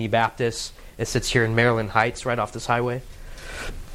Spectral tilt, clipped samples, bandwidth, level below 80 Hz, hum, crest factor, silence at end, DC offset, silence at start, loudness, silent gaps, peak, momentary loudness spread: -4.5 dB/octave; under 0.1%; 15.5 kHz; -40 dBFS; none; 22 dB; 0 s; under 0.1%; 0 s; -23 LUFS; none; -2 dBFS; 15 LU